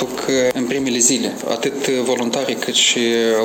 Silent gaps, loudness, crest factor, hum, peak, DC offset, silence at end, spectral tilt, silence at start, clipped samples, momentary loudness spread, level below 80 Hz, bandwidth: none; -17 LUFS; 18 dB; none; 0 dBFS; under 0.1%; 0 s; -2 dB/octave; 0 s; under 0.1%; 6 LU; -58 dBFS; 17.5 kHz